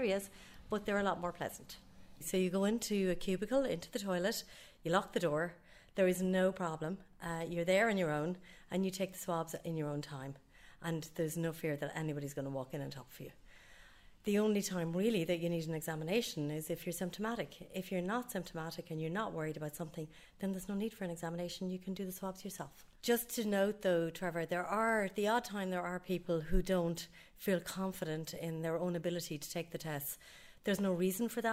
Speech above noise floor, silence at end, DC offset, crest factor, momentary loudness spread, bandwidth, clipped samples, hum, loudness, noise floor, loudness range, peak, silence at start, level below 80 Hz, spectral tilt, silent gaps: 22 dB; 0 s; under 0.1%; 20 dB; 12 LU; 16 kHz; under 0.1%; none; -38 LUFS; -60 dBFS; 6 LU; -18 dBFS; 0 s; -54 dBFS; -5 dB/octave; none